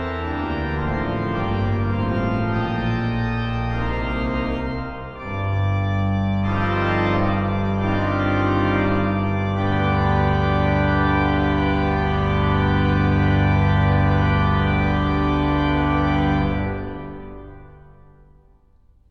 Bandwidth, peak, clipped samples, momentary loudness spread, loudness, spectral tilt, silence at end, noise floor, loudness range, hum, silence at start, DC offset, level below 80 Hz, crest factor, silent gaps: 6.2 kHz; -6 dBFS; under 0.1%; 7 LU; -21 LUFS; -8.5 dB/octave; 1.3 s; -54 dBFS; 5 LU; none; 0 s; under 0.1%; -30 dBFS; 14 dB; none